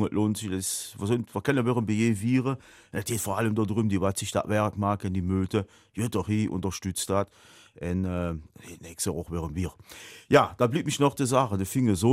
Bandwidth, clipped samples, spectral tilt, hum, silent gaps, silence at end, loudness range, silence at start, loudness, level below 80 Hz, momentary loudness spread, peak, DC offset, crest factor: 16 kHz; under 0.1%; -5.5 dB/octave; none; none; 0 s; 5 LU; 0 s; -27 LUFS; -52 dBFS; 12 LU; -4 dBFS; under 0.1%; 22 dB